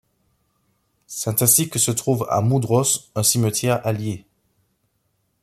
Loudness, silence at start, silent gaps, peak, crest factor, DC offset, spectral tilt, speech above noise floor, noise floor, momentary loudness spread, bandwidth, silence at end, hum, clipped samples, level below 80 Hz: -19 LUFS; 1.1 s; none; -2 dBFS; 20 dB; under 0.1%; -4 dB/octave; 50 dB; -69 dBFS; 12 LU; 16 kHz; 1.25 s; none; under 0.1%; -58 dBFS